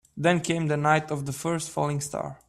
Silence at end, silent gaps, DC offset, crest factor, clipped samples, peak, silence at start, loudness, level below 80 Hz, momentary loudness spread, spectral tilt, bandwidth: 0.1 s; none; under 0.1%; 18 dB; under 0.1%; -8 dBFS; 0.15 s; -26 LUFS; -60 dBFS; 7 LU; -5 dB/octave; 13.5 kHz